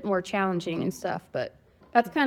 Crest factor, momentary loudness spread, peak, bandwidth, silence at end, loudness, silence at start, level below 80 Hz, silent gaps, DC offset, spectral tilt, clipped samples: 22 dB; 8 LU; -6 dBFS; 16.5 kHz; 0 s; -29 LUFS; 0 s; -64 dBFS; none; under 0.1%; -5.5 dB/octave; under 0.1%